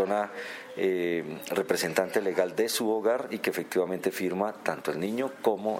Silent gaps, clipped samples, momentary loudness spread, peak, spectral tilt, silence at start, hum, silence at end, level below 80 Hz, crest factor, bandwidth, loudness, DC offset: none; under 0.1%; 5 LU; -10 dBFS; -4 dB/octave; 0 s; none; 0 s; -76 dBFS; 20 dB; 16.5 kHz; -29 LUFS; under 0.1%